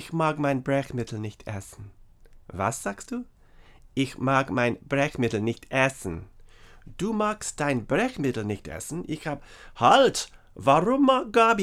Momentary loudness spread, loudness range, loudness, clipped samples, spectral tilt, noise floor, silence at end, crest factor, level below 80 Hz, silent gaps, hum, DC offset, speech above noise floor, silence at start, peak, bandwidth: 16 LU; 8 LU; -25 LUFS; under 0.1%; -5 dB/octave; -52 dBFS; 0 s; 22 dB; -52 dBFS; none; none; under 0.1%; 27 dB; 0 s; -4 dBFS; 15 kHz